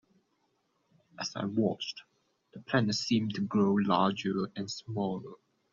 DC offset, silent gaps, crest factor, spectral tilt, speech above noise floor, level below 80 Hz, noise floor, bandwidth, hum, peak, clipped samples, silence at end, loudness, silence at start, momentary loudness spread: under 0.1%; none; 20 dB; -5 dB/octave; 45 dB; -70 dBFS; -76 dBFS; 7.4 kHz; none; -12 dBFS; under 0.1%; 0.35 s; -31 LUFS; 1.2 s; 12 LU